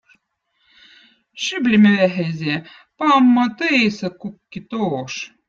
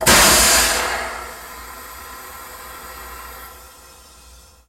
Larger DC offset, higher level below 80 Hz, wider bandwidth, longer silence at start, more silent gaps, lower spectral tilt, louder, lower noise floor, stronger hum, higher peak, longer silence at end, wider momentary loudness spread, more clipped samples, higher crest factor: neither; second, -60 dBFS vs -36 dBFS; second, 7.6 kHz vs 17 kHz; first, 1.35 s vs 0 s; neither; first, -5.5 dB/octave vs -1 dB/octave; second, -18 LUFS vs -13 LUFS; first, -68 dBFS vs -46 dBFS; neither; about the same, -2 dBFS vs 0 dBFS; second, 0.2 s vs 1.15 s; second, 16 LU vs 24 LU; neither; about the same, 16 dB vs 20 dB